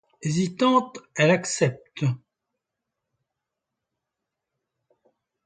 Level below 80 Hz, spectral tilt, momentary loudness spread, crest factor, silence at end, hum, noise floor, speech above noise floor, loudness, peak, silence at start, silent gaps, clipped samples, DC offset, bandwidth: -68 dBFS; -5 dB/octave; 8 LU; 22 dB; 3.3 s; none; -84 dBFS; 62 dB; -24 LUFS; -6 dBFS; 0.2 s; none; under 0.1%; under 0.1%; 9.6 kHz